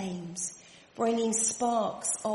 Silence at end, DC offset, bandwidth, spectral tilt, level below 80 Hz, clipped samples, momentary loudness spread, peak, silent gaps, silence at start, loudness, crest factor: 0 s; under 0.1%; 11.5 kHz; -3.5 dB/octave; -70 dBFS; under 0.1%; 11 LU; -16 dBFS; none; 0 s; -30 LUFS; 16 dB